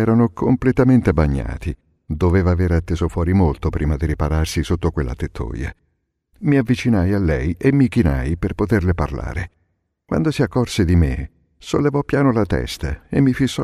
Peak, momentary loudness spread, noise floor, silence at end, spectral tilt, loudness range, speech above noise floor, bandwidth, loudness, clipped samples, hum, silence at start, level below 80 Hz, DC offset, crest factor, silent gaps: -2 dBFS; 11 LU; -69 dBFS; 0 s; -7.5 dB/octave; 3 LU; 51 dB; 13 kHz; -19 LUFS; under 0.1%; none; 0 s; -28 dBFS; under 0.1%; 16 dB; none